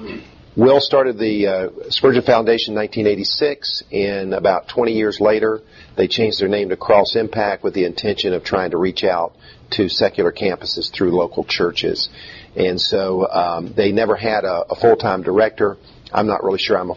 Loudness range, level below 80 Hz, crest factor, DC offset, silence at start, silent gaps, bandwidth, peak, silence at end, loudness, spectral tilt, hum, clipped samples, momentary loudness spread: 3 LU; -50 dBFS; 18 dB; under 0.1%; 0 s; none; 7.2 kHz; 0 dBFS; 0 s; -18 LUFS; -5.5 dB/octave; none; under 0.1%; 7 LU